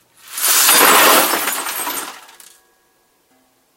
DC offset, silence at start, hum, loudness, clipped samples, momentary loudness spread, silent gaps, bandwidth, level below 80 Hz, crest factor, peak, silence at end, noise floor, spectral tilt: under 0.1%; 0.3 s; none; -11 LUFS; under 0.1%; 17 LU; none; over 20 kHz; -64 dBFS; 16 dB; 0 dBFS; 1.6 s; -59 dBFS; 0.5 dB/octave